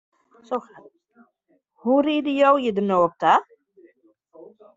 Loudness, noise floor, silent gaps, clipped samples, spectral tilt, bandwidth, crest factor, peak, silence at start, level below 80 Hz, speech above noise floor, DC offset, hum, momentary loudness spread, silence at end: -21 LUFS; -67 dBFS; none; under 0.1%; -4 dB/octave; 7.6 kHz; 18 dB; -6 dBFS; 0.5 s; -68 dBFS; 47 dB; under 0.1%; none; 13 LU; 0.3 s